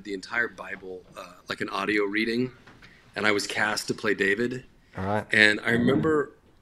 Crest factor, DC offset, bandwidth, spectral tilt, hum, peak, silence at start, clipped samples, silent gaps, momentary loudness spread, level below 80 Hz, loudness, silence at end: 26 dB; under 0.1%; 14 kHz; -4.5 dB/octave; none; 0 dBFS; 0 s; under 0.1%; none; 19 LU; -60 dBFS; -25 LUFS; 0.3 s